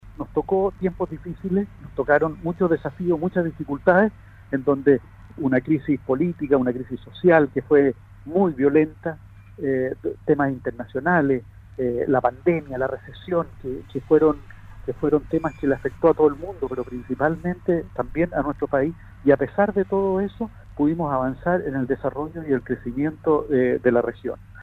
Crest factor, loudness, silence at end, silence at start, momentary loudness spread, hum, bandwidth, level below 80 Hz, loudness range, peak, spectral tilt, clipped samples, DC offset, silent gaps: 20 dB; -23 LUFS; 0 s; 0.05 s; 12 LU; none; 4.4 kHz; -46 dBFS; 3 LU; -2 dBFS; -10 dB/octave; under 0.1%; under 0.1%; none